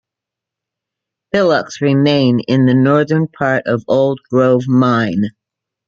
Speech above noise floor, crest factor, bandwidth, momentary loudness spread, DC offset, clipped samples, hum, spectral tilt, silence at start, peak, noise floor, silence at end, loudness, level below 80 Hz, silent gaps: 71 dB; 14 dB; 7.2 kHz; 5 LU; under 0.1%; under 0.1%; none; -7.5 dB/octave; 1.35 s; -2 dBFS; -84 dBFS; 0.55 s; -14 LUFS; -56 dBFS; none